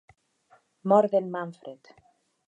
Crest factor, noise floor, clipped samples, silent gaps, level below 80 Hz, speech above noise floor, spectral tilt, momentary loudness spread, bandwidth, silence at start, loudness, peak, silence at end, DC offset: 20 dB; -63 dBFS; under 0.1%; none; -78 dBFS; 38 dB; -8.5 dB/octave; 23 LU; 8 kHz; 0.85 s; -25 LUFS; -8 dBFS; 0.75 s; under 0.1%